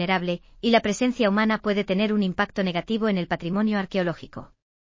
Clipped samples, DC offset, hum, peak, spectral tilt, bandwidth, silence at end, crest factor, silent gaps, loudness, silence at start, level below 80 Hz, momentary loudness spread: under 0.1%; under 0.1%; none; -4 dBFS; -6 dB/octave; 7.6 kHz; 0.4 s; 20 dB; none; -24 LUFS; 0 s; -54 dBFS; 8 LU